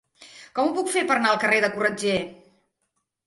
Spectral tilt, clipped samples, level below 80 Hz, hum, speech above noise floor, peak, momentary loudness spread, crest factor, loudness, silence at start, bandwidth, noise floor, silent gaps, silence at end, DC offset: -3.5 dB/octave; under 0.1%; -64 dBFS; none; 54 dB; -6 dBFS; 8 LU; 20 dB; -22 LUFS; 0.2 s; 11.5 kHz; -77 dBFS; none; 0.95 s; under 0.1%